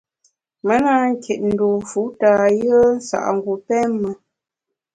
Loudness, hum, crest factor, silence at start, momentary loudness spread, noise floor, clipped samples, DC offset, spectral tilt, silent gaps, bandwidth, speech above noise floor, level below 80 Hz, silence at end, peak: -18 LUFS; none; 16 dB; 0.65 s; 10 LU; -82 dBFS; under 0.1%; under 0.1%; -6 dB/octave; none; 9.4 kHz; 65 dB; -56 dBFS; 0.8 s; -2 dBFS